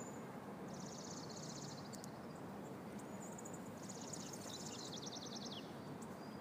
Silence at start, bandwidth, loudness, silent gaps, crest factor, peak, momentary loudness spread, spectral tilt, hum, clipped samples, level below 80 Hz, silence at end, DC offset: 0 s; 15.5 kHz; -50 LUFS; none; 20 dB; -30 dBFS; 4 LU; -4 dB/octave; none; under 0.1%; -78 dBFS; 0 s; under 0.1%